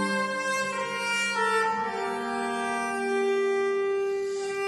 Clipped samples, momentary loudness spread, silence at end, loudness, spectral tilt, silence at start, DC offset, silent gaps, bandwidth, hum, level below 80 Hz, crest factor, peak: under 0.1%; 5 LU; 0 s; -27 LUFS; -3 dB/octave; 0 s; under 0.1%; none; 12.5 kHz; none; -70 dBFS; 12 dB; -16 dBFS